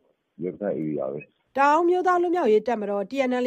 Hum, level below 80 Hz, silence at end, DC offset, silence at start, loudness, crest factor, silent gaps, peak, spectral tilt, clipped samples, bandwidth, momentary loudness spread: none; -70 dBFS; 0 s; under 0.1%; 0.4 s; -23 LUFS; 14 dB; none; -10 dBFS; -6.5 dB/octave; under 0.1%; 9 kHz; 13 LU